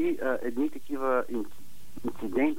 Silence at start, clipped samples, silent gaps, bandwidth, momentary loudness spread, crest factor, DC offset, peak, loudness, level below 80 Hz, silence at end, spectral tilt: 0 s; under 0.1%; none; 16 kHz; 10 LU; 16 dB; 2%; -14 dBFS; -31 LUFS; -60 dBFS; 0 s; -6 dB/octave